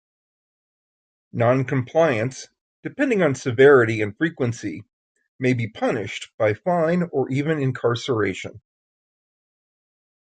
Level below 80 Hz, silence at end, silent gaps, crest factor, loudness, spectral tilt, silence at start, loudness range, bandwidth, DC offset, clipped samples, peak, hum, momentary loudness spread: -60 dBFS; 1.7 s; 2.61-2.83 s, 4.93-5.15 s, 5.28-5.39 s, 6.34-6.38 s; 20 dB; -21 LUFS; -6.5 dB/octave; 1.35 s; 5 LU; 9.2 kHz; under 0.1%; under 0.1%; -2 dBFS; none; 17 LU